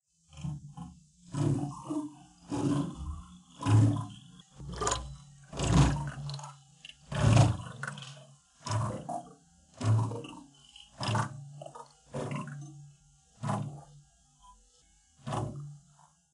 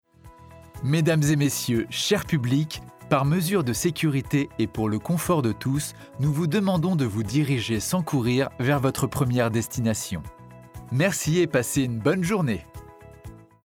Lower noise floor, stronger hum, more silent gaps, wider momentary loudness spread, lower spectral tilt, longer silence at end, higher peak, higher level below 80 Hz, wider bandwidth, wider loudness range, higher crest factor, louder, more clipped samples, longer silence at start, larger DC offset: first, -65 dBFS vs -49 dBFS; neither; neither; first, 25 LU vs 10 LU; about the same, -6 dB/octave vs -5.5 dB/octave; first, 0.55 s vs 0.25 s; about the same, -10 dBFS vs -8 dBFS; about the same, -46 dBFS vs -50 dBFS; second, 11.5 kHz vs 18 kHz; first, 11 LU vs 2 LU; first, 22 dB vs 16 dB; second, -32 LUFS vs -24 LUFS; neither; about the same, 0.35 s vs 0.25 s; neither